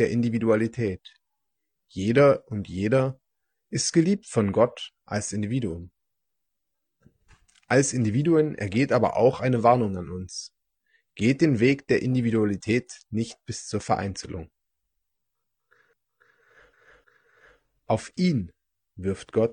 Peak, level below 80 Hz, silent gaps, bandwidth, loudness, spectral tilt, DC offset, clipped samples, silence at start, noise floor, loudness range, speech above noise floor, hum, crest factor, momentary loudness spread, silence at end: -6 dBFS; -60 dBFS; none; 10 kHz; -25 LUFS; -6 dB/octave; under 0.1%; under 0.1%; 0 s; -84 dBFS; 10 LU; 60 dB; none; 20 dB; 14 LU; 0 s